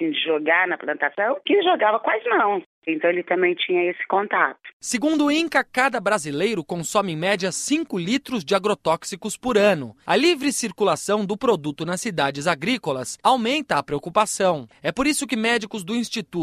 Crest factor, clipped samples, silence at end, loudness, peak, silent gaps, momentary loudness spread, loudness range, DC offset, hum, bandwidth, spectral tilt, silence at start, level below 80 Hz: 20 dB; under 0.1%; 0 s; -22 LUFS; -2 dBFS; 2.66-2.82 s, 4.73-4.80 s; 7 LU; 2 LU; under 0.1%; none; 14.5 kHz; -3.5 dB/octave; 0 s; -58 dBFS